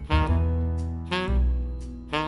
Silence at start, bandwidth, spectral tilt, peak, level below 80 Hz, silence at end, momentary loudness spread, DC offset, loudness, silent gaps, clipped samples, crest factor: 0 s; 11 kHz; -7 dB/octave; -8 dBFS; -26 dBFS; 0 s; 8 LU; under 0.1%; -27 LUFS; none; under 0.1%; 16 dB